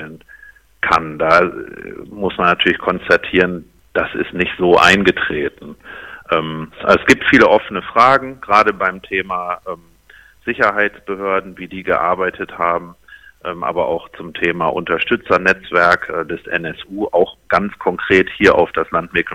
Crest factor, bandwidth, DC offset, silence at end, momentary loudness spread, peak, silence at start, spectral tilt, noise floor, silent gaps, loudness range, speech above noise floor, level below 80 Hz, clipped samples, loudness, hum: 16 dB; 15.5 kHz; under 0.1%; 0 s; 15 LU; 0 dBFS; 0 s; -5 dB/octave; -46 dBFS; none; 6 LU; 30 dB; -44 dBFS; under 0.1%; -15 LUFS; none